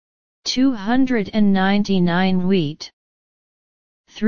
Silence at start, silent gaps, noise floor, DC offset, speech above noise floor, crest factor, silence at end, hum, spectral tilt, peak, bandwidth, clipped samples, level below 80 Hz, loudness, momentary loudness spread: 0.4 s; 2.93-4.04 s; under -90 dBFS; 4%; over 73 dB; 14 dB; 0 s; none; -6 dB/octave; -4 dBFS; 7.2 kHz; under 0.1%; -46 dBFS; -19 LUFS; 10 LU